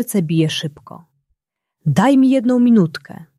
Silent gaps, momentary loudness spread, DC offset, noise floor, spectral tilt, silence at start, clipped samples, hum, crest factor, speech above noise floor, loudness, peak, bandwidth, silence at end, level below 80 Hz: none; 12 LU; under 0.1%; -76 dBFS; -6.5 dB/octave; 0 s; under 0.1%; none; 14 dB; 61 dB; -15 LUFS; -2 dBFS; 14 kHz; 0.15 s; -60 dBFS